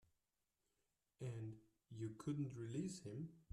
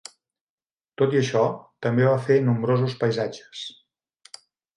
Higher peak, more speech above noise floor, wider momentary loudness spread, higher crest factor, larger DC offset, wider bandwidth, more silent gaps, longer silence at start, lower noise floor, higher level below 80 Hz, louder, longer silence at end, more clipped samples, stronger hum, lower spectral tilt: second, -34 dBFS vs -6 dBFS; first, 42 dB vs 36 dB; second, 8 LU vs 16 LU; about the same, 18 dB vs 18 dB; neither; first, 13 kHz vs 11 kHz; neither; first, 1.2 s vs 1 s; first, -90 dBFS vs -58 dBFS; second, -80 dBFS vs -66 dBFS; second, -50 LUFS vs -23 LUFS; second, 0.1 s vs 1.05 s; neither; neither; about the same, -7 dB/octave vs -7 dB/octave